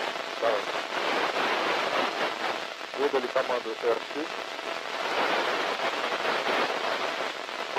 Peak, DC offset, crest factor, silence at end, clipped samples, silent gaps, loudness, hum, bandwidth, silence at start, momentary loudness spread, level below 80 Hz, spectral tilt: -12 dBFS; under 0.1%; 16 dB; 0 s; under 0.1%; none; -28 LUFS; none; 16 kHz; 0 s; 7 LU; -76 dBFS; -2 dB/octave